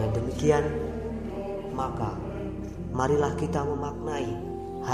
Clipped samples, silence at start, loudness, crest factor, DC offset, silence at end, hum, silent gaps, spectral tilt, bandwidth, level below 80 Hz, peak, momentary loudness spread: under 0.1%; 0 s; -29 LUFS; 20 dB; under 0.1%; 0 s; none; none; -7 dB/octave; 13 kHz; -44 dBFS; -8 dBFS; 10 LU